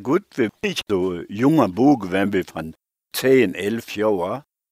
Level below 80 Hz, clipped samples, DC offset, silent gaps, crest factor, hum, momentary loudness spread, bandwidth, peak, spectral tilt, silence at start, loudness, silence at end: -58 dBFS; under 0.1%; under 0.1%; none; 20 dB; none; 13 LU; 16 kHz; -2 dBFS; -6 dB/octave; 0 s; -20 LUFS; 0.3 s